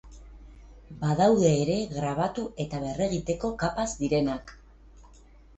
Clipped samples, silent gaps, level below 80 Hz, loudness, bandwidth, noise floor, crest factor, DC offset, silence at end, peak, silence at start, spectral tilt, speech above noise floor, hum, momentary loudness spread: under 0.1%; none; -48 dBFS; -27 LUFS; 8.4 kHz; -53 dBFS; 18 dB; under 0.1%; 0.5 s; -10 dBFS; 0.05 s; -6 dB/octave; 27 dB; none; 11 LU